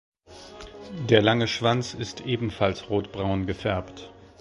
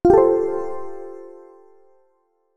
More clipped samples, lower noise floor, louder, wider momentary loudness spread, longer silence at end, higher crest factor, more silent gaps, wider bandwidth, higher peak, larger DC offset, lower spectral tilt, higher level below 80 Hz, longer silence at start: neither; second, -46 dBFS vs -66 dBFS; second, -25 LUFS vs -19 LUFS; second, 22 LU vs 25 LU; second, 0.25 s vs 0.6 s; first, 24 dB vs 18 dB; neither; first, 11.5 kHz vs 7.4 kHz; about the same, -2 dBFS vs -2 dBFS; neither; second, -5.5 dB/octave vs -9.5 dB/octave; about the same, -48 dBFS vs -44 dBFS; first, 0.3 s vs 0.05 s